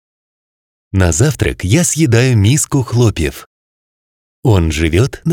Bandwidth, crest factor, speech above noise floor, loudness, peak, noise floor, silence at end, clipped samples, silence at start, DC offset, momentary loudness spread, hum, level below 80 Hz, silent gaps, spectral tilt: 17.5 kHz; 14 dB; over 78 dB; -13 LUFS; 0 dBFS; under -90 dBFS; 0 s; under 0.1%; 0.95 s; under 0.1%; 7 LU; none; -32 dBFS; 3.46-4.43 s; -5 dB/octave